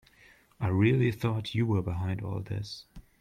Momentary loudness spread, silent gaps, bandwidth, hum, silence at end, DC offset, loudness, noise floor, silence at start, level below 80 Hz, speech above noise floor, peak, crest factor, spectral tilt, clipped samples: 12 LU; none; 14 kHz; none; 0.2 s; under 0.1%; -30 LUFS; -60 dBFS; 0.6 s; -56 dBFS; 31 dB; -12 dBFS; 18 dB; -8 dB/octave; under 0.1%